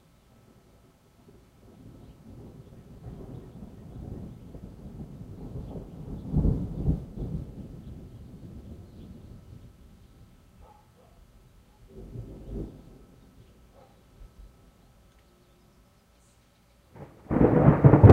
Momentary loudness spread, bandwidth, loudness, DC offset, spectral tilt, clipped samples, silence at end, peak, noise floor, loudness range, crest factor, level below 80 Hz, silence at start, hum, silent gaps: 27 LU; 4.7 kHz; -26 LUFS; under 0.1%; -10.5 dB/octave; under 0.1%; 0 s; 0 dBFS; -61 dBFS; 18 LU; 28 dB; -42 dBFS; 3.05 s; none; none